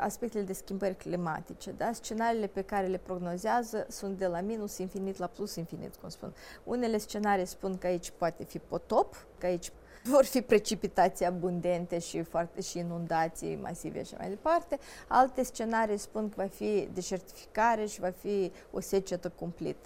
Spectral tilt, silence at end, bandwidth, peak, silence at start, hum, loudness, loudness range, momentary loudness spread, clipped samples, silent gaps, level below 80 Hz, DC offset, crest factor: -5 dB/octave; 0 s; 16 kHz; -10 dBFS; 0 s; none; -33 LUFS; 5 LU; 12 LU; under 0.1%; none; -56 dBFS; under 0.1%; 22 dB